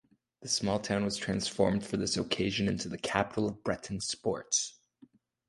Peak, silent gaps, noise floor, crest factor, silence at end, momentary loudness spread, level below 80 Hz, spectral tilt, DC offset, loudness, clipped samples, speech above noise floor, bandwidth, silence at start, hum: -10 dBFS; none; -62 dBFS; 24 dB; 0.8 s; 6 LU; -58 dBFS; -3.5 dB/octave; under 0.1%; -32 LUFS; under 0.1%; 30 dB; 11.5 kHz; 0.4 s; none